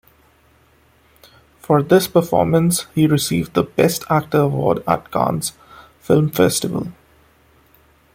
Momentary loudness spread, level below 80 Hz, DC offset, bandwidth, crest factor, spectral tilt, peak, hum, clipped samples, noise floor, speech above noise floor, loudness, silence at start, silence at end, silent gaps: 9 LU; -50 dBFS; under 0.1%; 16.5 kHz; 18 dB; -5.5 dB/octave; -2 dBFS; none; under 0.1%; -55 dBFS; 38 dB; -17 LUFS; 1.7 s; 1.25 s; none